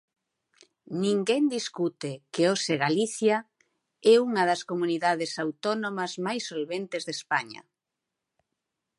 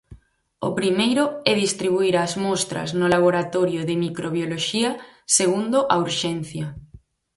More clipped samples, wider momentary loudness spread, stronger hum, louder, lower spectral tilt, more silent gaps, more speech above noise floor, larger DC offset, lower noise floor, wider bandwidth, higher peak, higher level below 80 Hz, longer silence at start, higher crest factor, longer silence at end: neither; about the same, 10 LU vs 9 LU; neither; second, -27 LUFS vs -21 LUFS; about the same, -4.5 dB/octave vs -4 dB/octave; neither; first, 60 dB vs 29 dB; neither; first, -86 dBFS vs -50 dBFS; about the same, 11.5 kHz vs 11.5 kHz; second, -8 dBFS vs -2 dBFS; second, -82 dBFS vs -56 dBFS; first, 0.9 s vs 0.1 s; about the same, 20 dB vs 20 dB; first, 1.4 s vs 0.4 s